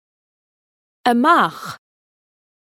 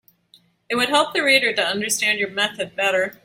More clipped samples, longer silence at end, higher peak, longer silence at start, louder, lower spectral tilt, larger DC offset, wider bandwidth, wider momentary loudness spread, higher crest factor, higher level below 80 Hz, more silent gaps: neither; first, 1.05 s vs 0.15 s; first, 0 dBFS vs -4 dBFS; first, 1.05 s vs 0.7 s; first, -16 LUFS vs -19 LUFS; first, -4.5 dB/octave vs -1.5 dB/octave; neither; about the same, 16 kHz vs 16.5 kHz; first, 19 LU vs 7 LU; about the same, 20 dB vs 18 dB; second, -74 dBFS vs -66 dBFS; neither